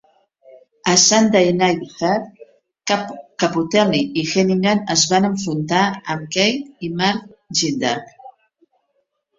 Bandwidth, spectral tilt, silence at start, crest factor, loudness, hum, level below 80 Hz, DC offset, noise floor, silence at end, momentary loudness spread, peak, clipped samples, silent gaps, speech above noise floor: 7.8 kHz; -3.5 dB/octave; 0.85 s; 20 dB; -17 LUFS; none; -58 dBFS; under 0.1%; -70 dBFS; 1.1 s; 12 LU; 0 dBFS; under 0.1%; none; 52 dB